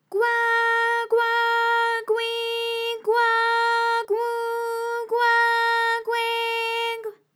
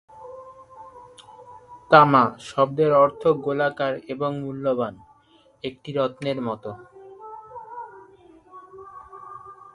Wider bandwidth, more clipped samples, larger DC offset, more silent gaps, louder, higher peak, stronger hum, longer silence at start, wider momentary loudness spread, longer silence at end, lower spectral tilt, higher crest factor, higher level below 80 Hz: first, 18 kHz vs 11.5 kHz; neither; neither; neither; about the same, -22 LUFS vs -21 LUFS; second, -10 dBFS vs 0 dBFS; neither; about the same, 0.1 s vs 0.15 s; second, 7 LU vs 26 LU; about the same, 0.2 s vs 0.2 s; second, 0.5 dB/octave vs -7 dB/octave; second, 12 dB vs 24 dB; second, under -90 dBFS vs -64 dBFS